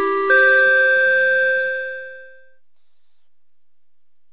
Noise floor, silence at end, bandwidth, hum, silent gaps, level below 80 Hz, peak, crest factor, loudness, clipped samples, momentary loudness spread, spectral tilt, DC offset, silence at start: -84 dBFS; 2.05 s; 4 kHz; 50 Hz at -90 dBFS; none; -66 dBFS; -4 dBFS; 14 dB; -14 LUFS; under 0.1%; 14 LU; -5.5 dB/octave; 0.7%; 0 s